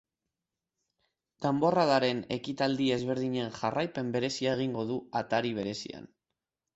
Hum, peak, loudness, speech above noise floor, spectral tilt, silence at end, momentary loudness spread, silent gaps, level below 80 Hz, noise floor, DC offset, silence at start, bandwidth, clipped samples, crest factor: none; -12 dBFS; -30 LUFS; 59 dB; -5.5 dB/octave; 0.7 s; 9 LU; none; -68 dBFS; -89 dBFS; under 0.1%; 1.4 s; 8.2 kHz; under 0.1%; 20 dB